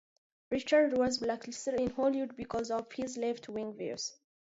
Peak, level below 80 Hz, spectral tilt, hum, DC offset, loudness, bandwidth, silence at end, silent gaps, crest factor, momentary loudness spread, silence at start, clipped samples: -16 dBFS; -66 dBFS; -4 dB/octave; none; under 0.1%; -33 LUFS; 8 kHz; 0.3 s; none; 18 dB; 12 LU; 0.5 s; under 0.1%